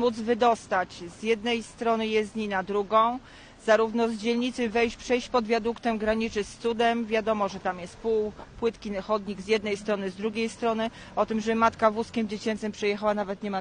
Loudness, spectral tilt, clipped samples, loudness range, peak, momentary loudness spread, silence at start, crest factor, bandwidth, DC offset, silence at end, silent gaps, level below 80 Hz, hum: -27 LUFS; -5 dB/octave; under 0.1%; 3 LU; -8 dBFS; 7 LU; 0 s; 20 dB; 10 kHz; under 0.1%; 0 s; none; -54 dBFS; none